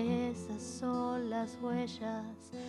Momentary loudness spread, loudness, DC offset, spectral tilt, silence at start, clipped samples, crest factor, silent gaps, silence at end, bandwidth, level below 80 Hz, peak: 7 LU; -38 LUFS; under 0.1%; -6 dB/octave; 0 s; under 0.1%; 14 dB; none; 0 s; 12 kHz; -68 dBFS; -22 dBFS